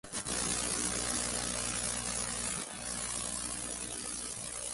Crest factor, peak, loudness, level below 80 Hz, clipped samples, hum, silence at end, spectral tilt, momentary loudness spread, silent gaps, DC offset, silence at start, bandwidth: 18 dB; -18 dBFS; -34 LUFS; -52 dBFS; under 0.1%; 60 Hz at -50 dBFS; 0 s; -1.5 dB/octave; 6 LU; none; under 0.1%; 0.05 s; 12 kHz